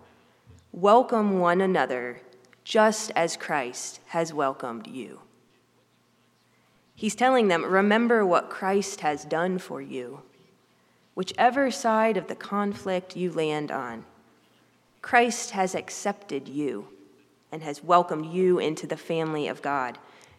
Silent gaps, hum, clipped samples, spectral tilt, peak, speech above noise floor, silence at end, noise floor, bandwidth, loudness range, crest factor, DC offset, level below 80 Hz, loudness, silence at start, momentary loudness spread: none; 60 Hz at -60 dBFS; under 0.1%; -4.5 dB/octave; -4 dBFS; 40 dB; 0.4 s; -65 dBFS; 14.5 kHz; 6 LU; 22 dB; under 0.1%; -76 dBFS; -25 LUFS; 0.75 s; 16 LU